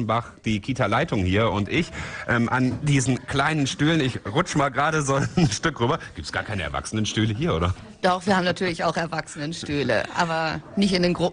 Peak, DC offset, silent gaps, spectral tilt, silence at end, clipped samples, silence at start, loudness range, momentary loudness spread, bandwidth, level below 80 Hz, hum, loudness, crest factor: -6 dBFS; under 0.1%; none; -5 dB/octave; 0 s; under 0.1%; 0 s; 2 LU; 7 LU; 10.5 kHz; -44 dBFS; none; -24 LUFS; 18 dB